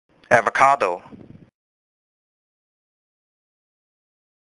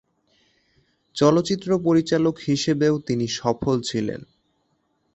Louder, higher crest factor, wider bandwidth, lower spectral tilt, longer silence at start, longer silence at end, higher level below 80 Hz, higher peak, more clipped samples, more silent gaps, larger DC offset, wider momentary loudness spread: first, -18 LUFS vs -22 LUFS; first, 24 dB vs 18 dB; first, 11.5 kHz vs 8.2 kHz; second, -4 dB/octave vs -6 dB/octave; second, 0.3 s vs 1.15 s; first, 3.3 s vs 0.9 s; second, -64 dBFS vs -56 dBFS; first, 0 dBFS vs -4 dBFS; neither; neither; neither; about the same, 10 LU vs 8 LU